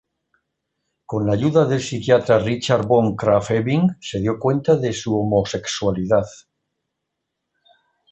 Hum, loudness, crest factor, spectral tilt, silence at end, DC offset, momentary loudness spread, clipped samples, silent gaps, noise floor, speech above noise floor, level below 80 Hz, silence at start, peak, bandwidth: none; -19 LUFS; 18 dB; -6 dB/octave; 1.75 s; under 0.1%; 6 LU; under 0.1%; none; -79 dBFS; 61 dB; -50 dBFS; 1.1 s; -2 dBFS; 8.4 kHz